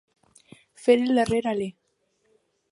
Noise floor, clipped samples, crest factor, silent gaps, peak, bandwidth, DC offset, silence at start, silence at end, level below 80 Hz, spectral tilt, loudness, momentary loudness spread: -71 dBFS; under 0.1%; 20 dB; none; -6 dBFS; 11.5 kHz; under 0.1%; 0.8 s; 1 s; -58 dBFS; -5.5 dB/octave; -24 LUFS; 10 LU